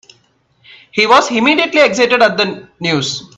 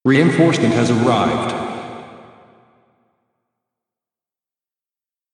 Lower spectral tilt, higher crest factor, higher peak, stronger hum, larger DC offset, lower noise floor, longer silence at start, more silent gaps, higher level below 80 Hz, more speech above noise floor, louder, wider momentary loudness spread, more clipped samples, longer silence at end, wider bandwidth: second, -3.5 dB/octave vs -6 dB/octave; about the same, 14 dB vs 18 dB; about the same, 0 dBFS vs -2 dBFS; neither; neither; second, -56 dBFS vs under -90 dBFS; first, 0.95 s vs 0.05 s; neither; about the same, -56 dBFS vs -56 dBFS; second, 43 dB vs over 76 dB; first, -12 LUFS vs -16 LUFS; second, 8 LU vs 17 LU; neither; second, 0.15 s vs 3.1 s; about the same, 10.5 kHz vs 10.5 kHz